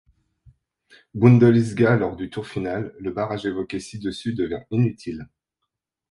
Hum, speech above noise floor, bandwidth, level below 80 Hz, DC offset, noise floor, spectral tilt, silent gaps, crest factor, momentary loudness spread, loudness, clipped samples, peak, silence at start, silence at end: none; 60 dB; 11 kHz; -52 dBFS; under 0.1%; -81 dBFS; -8 dB/octave; none; 22 dB; 16 LU; -22 LUFS; under 0.1%; -2 dBFS; 1.15 s; 0.9 s